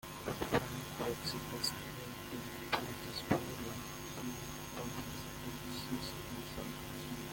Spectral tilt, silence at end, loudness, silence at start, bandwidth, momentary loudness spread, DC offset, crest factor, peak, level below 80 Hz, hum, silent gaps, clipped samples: -4 dB/octave; 0 s; -41 LUFS; 0.05 s; 17 kHz; 7 LU; under 0.1%; 26 dB; -16 dBFS; -58 dBFS; none; none; under 0.1%